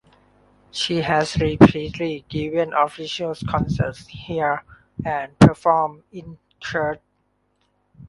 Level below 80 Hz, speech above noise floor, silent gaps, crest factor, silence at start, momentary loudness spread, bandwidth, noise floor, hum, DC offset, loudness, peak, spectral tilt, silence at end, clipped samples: -42 dBFS; 48 dB; none; 22 dB; 0.75 s; 20 LU; 11.5 kHz; -68 dBFS; 50 Hz at -45 dBFS; under 0.1%; -21 LUFS; 0 dBFS; -6.5 dB/octave; 0 s; under 0.1%